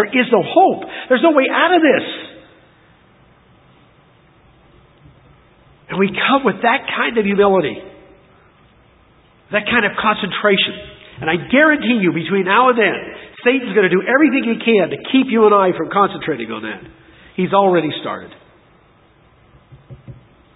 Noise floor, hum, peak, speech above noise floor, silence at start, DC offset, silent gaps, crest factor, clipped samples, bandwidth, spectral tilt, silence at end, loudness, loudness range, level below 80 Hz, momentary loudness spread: -51 dBFS; none; 0 dBFS; 36 dB; 0 s; under 0.1%; none; 18 dB; under 0.1%; 4 kHz; -9.5 dB/octave; 0.4 s; -15 LUFS; 7 LU; -54 dBFS; 14 LU